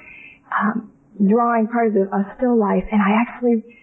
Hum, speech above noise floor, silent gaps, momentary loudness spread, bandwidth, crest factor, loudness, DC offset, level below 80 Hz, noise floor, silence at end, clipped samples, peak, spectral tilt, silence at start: none; 25 dB; none; 6 LU; 3.3 kHz; 12 dB; -19 LUFS; under 0.1%; -48 dBFS; -43 dBFS; 0.2 s; under 0.1%; -8 dBFS; -11 dB/octave; 0.1 s